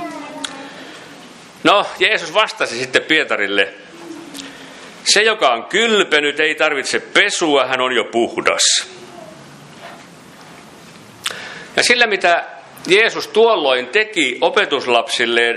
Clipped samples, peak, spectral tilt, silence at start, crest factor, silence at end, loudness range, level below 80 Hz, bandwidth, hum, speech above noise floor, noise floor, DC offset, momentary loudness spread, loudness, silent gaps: under 0.1%; 0 dBFS; -1.5 dB/octave; 0 s; 18 dB; 0 s; 5 LU; -66 dBFS; 14 kHz; none; 24 dB; -40 dBFS; under 0.1%; 20 LU; -15 LUFS; none